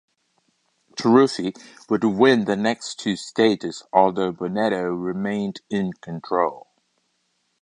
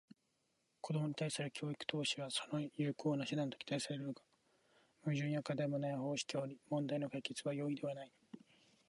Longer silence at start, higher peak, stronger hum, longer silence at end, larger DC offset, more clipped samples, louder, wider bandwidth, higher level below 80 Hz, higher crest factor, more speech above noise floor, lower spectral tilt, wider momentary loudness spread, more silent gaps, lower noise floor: about the same, 0.95 s vs 0.85 s; first, -2 dBFS vs -22 dBFS; neither; first, 1 s vs 0.5 s; neither; neither; first, -22 LUFS vs -41 LUFS; about the same, 10.5 kHz vs 11.5 kHz; first, -64 dBFS vs -86 dBFS; about the same, 22 dB vs 20 dB; first, 49 dB vs 41 dB; about the same, -5.5 dB/octave vs -5 dB/octave; about the same, 10 LU vs 9 LU; neither; second, -71 dBFS vs -82 dBFS